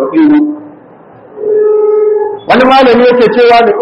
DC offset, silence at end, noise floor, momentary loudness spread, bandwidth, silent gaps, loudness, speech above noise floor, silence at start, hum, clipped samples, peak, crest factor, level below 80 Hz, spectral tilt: under 0.1%; 0 s; -35 dBFS; 9 LU; 7.6 kHz; none; -7 LUFS; 30 dB; 0 s; none; 0.8%; 0 dBFS; 8 dB; -44 dBFS; -6.5 dB/octave